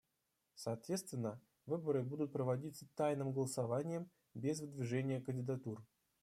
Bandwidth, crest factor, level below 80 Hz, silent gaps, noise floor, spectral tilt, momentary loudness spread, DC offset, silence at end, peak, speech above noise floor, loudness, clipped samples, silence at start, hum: 15 kHz; 16 dB; -82 dBFS; none; -86 dBFS; -6.5 dB/octave; 9 LU; under 0.1%; 0.4 s; -26 dBFS; 45 dB; -42 LUFS; under 0.1%; 0.55 s; none